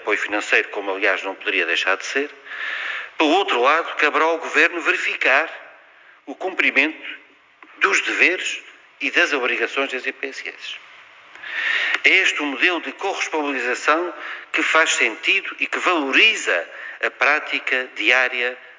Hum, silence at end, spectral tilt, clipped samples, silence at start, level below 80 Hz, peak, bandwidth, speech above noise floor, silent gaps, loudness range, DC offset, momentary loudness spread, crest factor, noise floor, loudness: none; 0.05 s; 0 dB/octave; under 0.1%; 0 s; -80 dBFS; 0 dBFS; 7.8 kHz; 29 dB; none; 3 LU; under 0.1%; 13 LU; 20 dB; -49 dBFS; -19 LUFS